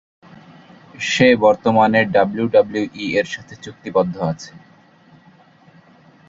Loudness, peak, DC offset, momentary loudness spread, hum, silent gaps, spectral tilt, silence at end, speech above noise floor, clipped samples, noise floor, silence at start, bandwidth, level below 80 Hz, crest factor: -17 LUFS; -2 dBFS; under 0.1%; 17 LU; none; none; -5.5 dB/octave; 1.7 s; 33 dB; under 0.1%; -50 dBFS; 1 s; 7.8 kHz; -56 dBFS; 18 dB